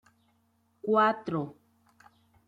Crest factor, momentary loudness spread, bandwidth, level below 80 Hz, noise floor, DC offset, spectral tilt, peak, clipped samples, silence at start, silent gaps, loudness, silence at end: 20 dB; 15 LU; 7.8 kHz; -74 dBFS; -71 dBFS; under 0.1%; -7.5 dB/octave; -14 dBFS; under 0.1%; 0.85 s; none; -28 LUFS; 0.95 s